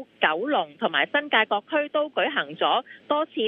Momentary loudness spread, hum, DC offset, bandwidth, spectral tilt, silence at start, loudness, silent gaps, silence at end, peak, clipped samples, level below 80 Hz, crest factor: 5 LU; none; under 0.1%; 4.2 kHz; -6.5 dB/octave; 0 s; -24 LUFS; none; 0 s; -4 dBFS; under 0.1%; -80 dBFS; 20 dB